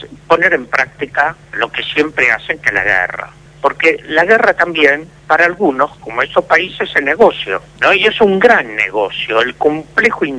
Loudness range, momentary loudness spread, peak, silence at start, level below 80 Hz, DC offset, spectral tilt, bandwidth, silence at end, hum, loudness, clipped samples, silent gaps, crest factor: 2 LU; 8 LU; 0 dBFS; 0 s; -46 dBFS; under 0.1%; -4.5 dB/octave; 11 kHz; 0 s; none; -13 LUFS; 0.4%; none; 14 dB